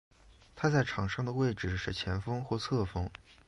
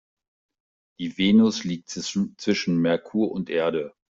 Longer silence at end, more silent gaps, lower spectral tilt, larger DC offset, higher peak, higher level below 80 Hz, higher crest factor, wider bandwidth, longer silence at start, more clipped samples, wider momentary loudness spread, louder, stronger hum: about the same, 0.15 s vs 0.2 s; neither; about the same, -6.5 dB/octave vs -5.5 dB/octave; neither; second, -16 dBFS vs -8 dBFS; first, -48 dBFS vs -64 dBFS; about the same, 18 dB vs 16 dB; first, 11.5 kHz vs 7.8 kHz; second, 0.3 s vs 1 s; neither; second, 6 LU vs 12 LU; second, -33 LUFS vs -24 LUFS; neither